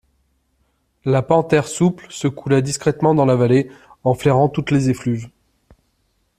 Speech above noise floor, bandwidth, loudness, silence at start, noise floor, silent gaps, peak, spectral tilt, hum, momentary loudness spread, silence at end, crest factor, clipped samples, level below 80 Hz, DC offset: 49 dB; 14 kHz; -18 LUFS; 1.05 s; -66 dBFS; none; 0 dBFS; -6.5 dB/octave; none; 9 LU; 1.1 s; 18 dB; under 0.1%; -52 dBFS; under 0.1%